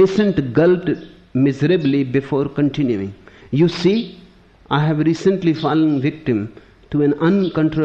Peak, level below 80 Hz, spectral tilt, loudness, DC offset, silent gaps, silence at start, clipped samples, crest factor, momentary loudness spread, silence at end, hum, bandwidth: -4 dBFS; -48 dBFS; -8 dB/octave; -18 LUFS; under 0.1%; none; 0 s; under 0.1%; 14 dB; 9 LU; 0 s; none; 8 kHz